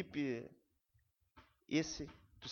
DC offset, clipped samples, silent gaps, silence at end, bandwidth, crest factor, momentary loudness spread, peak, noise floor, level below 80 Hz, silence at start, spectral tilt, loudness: under 0.1%; under 0.1%; none; 0 s; 7.2 kHz; 22 dB; 14 LU; -22 dBFS; -78 dBFS; -68 dBFS; 0 s; -4.5 dB/octave; -42 LUFS